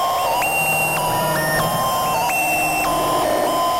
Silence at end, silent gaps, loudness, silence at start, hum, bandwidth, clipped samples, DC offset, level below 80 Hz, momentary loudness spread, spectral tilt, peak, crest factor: 0 s; none; -18 LUFS; 0 s; none; 16 kHz; under 0.1%; under 0.1%; -44 dBFS; 2 LU; -3 dB/octave; -8 dBFS; 10 dB